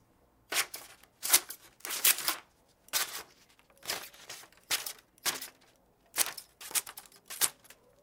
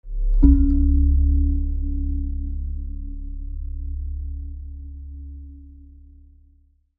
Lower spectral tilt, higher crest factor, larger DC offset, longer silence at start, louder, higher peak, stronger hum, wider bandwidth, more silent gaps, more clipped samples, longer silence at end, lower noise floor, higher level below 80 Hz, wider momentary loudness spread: second, 2 dB/octave vs -15 dB/octave; first, 30 dB vs 20 dB; neither; first, 0.5 s vs 0.05 s; second, -31 LUFS vs -23 LUFS; second, -6 dBFS vs -2 dBFS; neither; first, 18 kHz vs 1.5 kHz; neither; neither; second, 0.5 s vs 1.2 s; first, -67 dBFS vs -57 dBFS; second, -76 dBFS vs -22 dBFS; about the same, 20 LU vs 20 LU